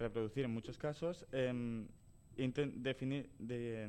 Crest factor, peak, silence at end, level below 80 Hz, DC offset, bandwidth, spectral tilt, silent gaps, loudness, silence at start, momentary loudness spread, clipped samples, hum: 16 dB; -26 dBFS; 0 s; -64 dBFS; under 0.1%; 10.5 kHz; -7 dB/octave; none; -42 LUFS; 0 s; 6 LU; under 0.1%; none